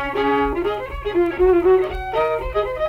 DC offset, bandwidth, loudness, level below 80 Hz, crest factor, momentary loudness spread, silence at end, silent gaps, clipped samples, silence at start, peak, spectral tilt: under 0.1%; 5.8 kHz; -19 LUFS; -34 dBFS; 14 dB; 8 LU; 0 s; none; under 0.1%; 0 s; -6 dBFS; -7.5 dB/octave